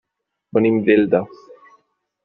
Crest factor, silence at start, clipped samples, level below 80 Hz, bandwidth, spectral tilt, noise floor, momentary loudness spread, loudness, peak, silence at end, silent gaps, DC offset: 16 dB; 0.55 s; under 0.1%; -60 dBFS; 5.4 kHz; -6.5 dB/octave; -65 dBFS; 8 LU; -17 LUFS; -4 dBFS; 1 s; none; under 0.1%